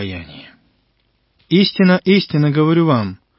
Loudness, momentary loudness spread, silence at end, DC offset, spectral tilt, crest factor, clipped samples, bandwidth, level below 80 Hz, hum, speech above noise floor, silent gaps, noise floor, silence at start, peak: -14 LUFS; 15 LU; 0.25 s; under 0.1%; -11 dB/octave; 16 dB; under 0.1%; 5.8 kHz; -48 dBFS; none; 48 dB; none; -63 dBFS; 0 s; -2 dBFS